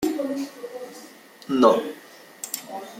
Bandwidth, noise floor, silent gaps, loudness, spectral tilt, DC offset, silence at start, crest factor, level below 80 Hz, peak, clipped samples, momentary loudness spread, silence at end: 16.5 kHz; -46 dBFS; none; -24 LUFS; -4 dB/octave; under 0.1%; 0 s; 24 dB; -66 dBFS; -2 dBFS; under 0.1%; 25 LU; 0 s